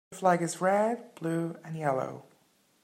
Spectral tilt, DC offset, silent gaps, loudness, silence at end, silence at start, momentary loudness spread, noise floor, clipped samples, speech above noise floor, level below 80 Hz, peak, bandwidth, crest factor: -6 dB/octave; under 0.1%; none; -30 LUFS; 0.6 s; 0.1 s; 10 LU; -67 dBFS; under 0.1%; 38 dB; -80 dBFS; -10 dBFS; 16 kHz; 20 dB